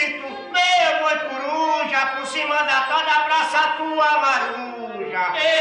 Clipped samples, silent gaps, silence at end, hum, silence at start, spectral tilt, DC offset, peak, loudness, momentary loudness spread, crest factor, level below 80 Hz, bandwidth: under 0.1%; none; 0 s; none; 0 s; -1 dB/octave; under 0.1%; -6 dBFS; -19 LUFS; 9 LU; 16 dB; -70 dBFS; 11 kHz